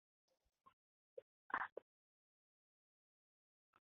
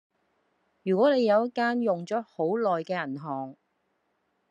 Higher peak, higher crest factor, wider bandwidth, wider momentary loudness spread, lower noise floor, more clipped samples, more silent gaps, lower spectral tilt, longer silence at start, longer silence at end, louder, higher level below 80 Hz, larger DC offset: second, -26 dBFS vs -12 dBFS; first, 30 dB vs 18 dB; second, 3.8 kHz vs 9 kHz; first, 17 LU vs 13 LU; first, under -90 dBFS vs -75 dBFS; neither; first, 1.22-1.50 s vs none; second, 5 dB/octave vs -7 dB/octave; first, 1.15 s vs 0.85 s; first, 2.15 s vs 1 s; second, -47 LUFS vs -27 LUFS; about the same, under -90 dBFS vs -86 dBFS; neither